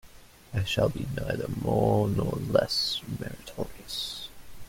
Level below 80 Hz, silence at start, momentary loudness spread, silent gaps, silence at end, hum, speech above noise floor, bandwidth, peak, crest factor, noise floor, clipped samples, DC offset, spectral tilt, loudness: -48 dBFS; 0.05 s; 13 LU; none; 0 s; none; 23 dB; 16.5 kHz; -8 dBFS; 22 dB; -51 dBFS; under 0.1%; under 0.1%; -5.5 dB/octave; -29 LUFS